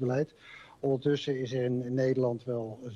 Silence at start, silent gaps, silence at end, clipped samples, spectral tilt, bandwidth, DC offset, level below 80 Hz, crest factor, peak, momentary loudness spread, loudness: 0 s; none; 0 s; under 0.1%; -7.5 dB/octave; 7.6 kHz; under 0.1%; -68 dBFS; 14 dB; -16 dBFS; 8 LU; -31 LUFS